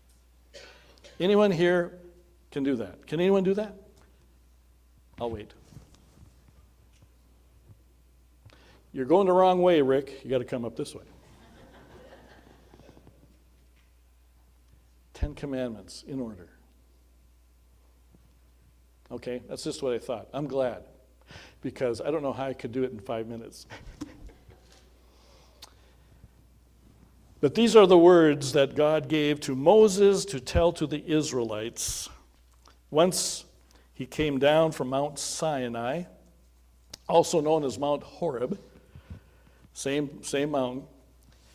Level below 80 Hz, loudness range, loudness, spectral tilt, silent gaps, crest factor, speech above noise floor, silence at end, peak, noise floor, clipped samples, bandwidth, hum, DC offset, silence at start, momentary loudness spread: -50 dBFS; 21 LU; -26 LUFS; -5 dB/octave; none; 22 dB; 34 dB; 0.7 s; -6 dBFS; -59 dBFS; under 0.1%; 16 kHz; none; under 0.1%; 0.55 s; 20 LU